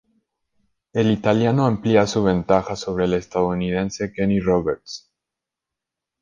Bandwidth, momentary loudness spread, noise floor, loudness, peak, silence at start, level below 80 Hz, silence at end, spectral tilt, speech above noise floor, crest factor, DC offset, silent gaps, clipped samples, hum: 9.2 kHz; 9 LU; -85 dBFS; -20 LUFS; -2 dBFS; 0.95 s; -46 dBFS; 1.25 s; -6.5 dB/octave; 66 dB; 20 dB; under 0.1%; none; under 0.1%; none